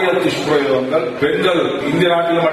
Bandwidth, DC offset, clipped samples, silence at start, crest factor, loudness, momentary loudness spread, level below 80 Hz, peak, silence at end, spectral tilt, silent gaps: 13.5 kHz; under 0.1%; under 0.1%; 0 s; 12 dB; -16 LUFS; 3 LU; -52 dBFS; -2 dBFS; 0 s; -5.5 dB/octave; none